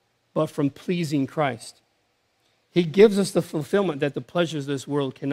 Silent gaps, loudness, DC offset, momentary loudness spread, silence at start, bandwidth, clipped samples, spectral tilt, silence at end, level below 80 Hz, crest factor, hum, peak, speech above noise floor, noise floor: none; -24 LUFS; under 0.1%; 11 LU; 0.35 s; 15.5 kHz; under 0.1%; -6 dB/octave; 0 s; -68 dBFS; 20 dB; none; -4 dBFS; 46 dB; -69 dBFS